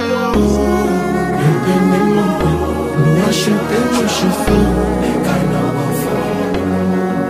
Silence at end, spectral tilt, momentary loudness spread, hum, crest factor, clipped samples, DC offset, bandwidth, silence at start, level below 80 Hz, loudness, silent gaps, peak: 0 s; -6 dB/octave; 4 LU; none; 14 dB; under 0.1%; under 0.1%; 16 kHz; 0 s; -28 dBFS; -15 LUFS; none; 0 dBFS